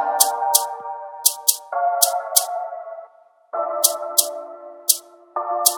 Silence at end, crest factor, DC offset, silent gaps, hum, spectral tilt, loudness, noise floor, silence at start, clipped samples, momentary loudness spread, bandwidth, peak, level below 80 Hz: 0 s; 22 dB; under 0.1%; none; none; 3 dB/octave; -19 LUFS; -49 dBFS; 0 s; under 0.1%; 16 LU; 19.5 kHz; 0 dBFS; -80 dBFS